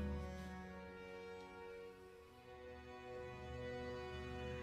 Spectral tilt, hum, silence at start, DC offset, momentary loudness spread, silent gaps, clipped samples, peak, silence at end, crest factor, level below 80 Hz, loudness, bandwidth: -6.5 dB/octave; none; 0 s; under 0.1%; 9 LU; none; under 0.1%; -34 dBFS; 0 s; 16 dB; -58 dBFS; -52 LUFS; 15 kHz